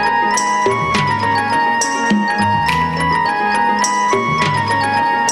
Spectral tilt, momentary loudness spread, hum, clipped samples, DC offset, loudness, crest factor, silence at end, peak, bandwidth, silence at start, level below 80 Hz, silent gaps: -3.5 dB/octave; 1 LU; none; under 0.1%; under 0.1%; -15 LUFS; 14 dB; 0 s; -2 dBFS; 14 kHz; 0 s; -42 dBFS; none